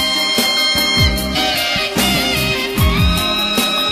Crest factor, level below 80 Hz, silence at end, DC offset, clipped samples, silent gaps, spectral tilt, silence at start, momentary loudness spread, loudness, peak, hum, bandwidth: 14 dB; -26 dBFS; 0 s; under 0.1%; under 0.1%; none; -3 dB/octave; 0 s; 3 LU; -14 LUFS; 0 dBFS; none; 15 kHz